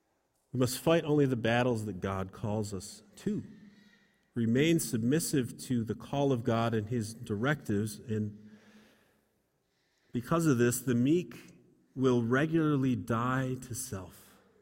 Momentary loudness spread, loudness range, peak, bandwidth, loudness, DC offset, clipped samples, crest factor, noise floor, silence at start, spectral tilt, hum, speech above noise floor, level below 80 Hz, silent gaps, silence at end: 13 LU; 5 LU; -14 dBFS; 16.5 kHz; -31 LUFS; under 0.1%; under 0.1%; 18 dB; -76 dBFS; 0.55 s; -6 dB/octave; none; 46 dB; -62 dBFS; none; 0.5 s